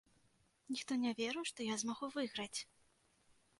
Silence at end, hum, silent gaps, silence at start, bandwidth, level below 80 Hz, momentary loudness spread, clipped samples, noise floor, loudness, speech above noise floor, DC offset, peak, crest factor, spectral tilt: 0.95 s; none; none; 0.7 s; 11.5 kHz; -82 dBFS; 7 LU; under 0.1%; -75 dBFS; -41 LUFS; 34 dB; under 0.1%; -28 dBFS; 16 dB; -2.5 dB/octave